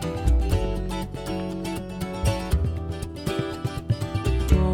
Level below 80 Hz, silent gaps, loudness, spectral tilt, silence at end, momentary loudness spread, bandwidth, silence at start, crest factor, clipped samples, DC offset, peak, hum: -28 dBFS; none; -27 LUFS; -6.5 dB/octave; 0 s; 8 LU; 16.5 kHz; 0 s; 20 dB; under 0.1%; under 0.1%; -6 dBFS; none